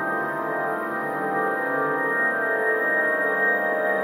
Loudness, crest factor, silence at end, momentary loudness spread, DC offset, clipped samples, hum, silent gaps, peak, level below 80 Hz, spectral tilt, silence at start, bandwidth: -23 LUFS; 12 dB; 0 s; 5 LU; under 0.1%; under 0.1%; none; none; -10 dBFS; -72 dBFS; -6 dB/octave; 0 s; 16 kHz